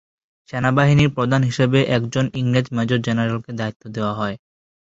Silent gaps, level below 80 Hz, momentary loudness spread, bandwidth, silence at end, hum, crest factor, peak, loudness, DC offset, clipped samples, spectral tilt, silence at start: 3.76-3.80 s; -48 dBFS; 12 LU; 8 kHz; 0.5 s; none; 18 dB; -2 dBFS; -19 LUFS; under 0.1%; under 0.1%; -6.5 dB/octave; 0.55 s